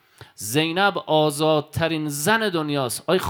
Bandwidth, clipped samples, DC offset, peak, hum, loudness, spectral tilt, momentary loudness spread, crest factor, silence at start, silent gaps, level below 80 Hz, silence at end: 19.5 kHz; under 0.1%; under 0.1%; -4 dBFS; none; -21 LUFS; -4 dB/octave; 5 LU; 18 dB; 0.2 s; none; -58 dBFS; 0 s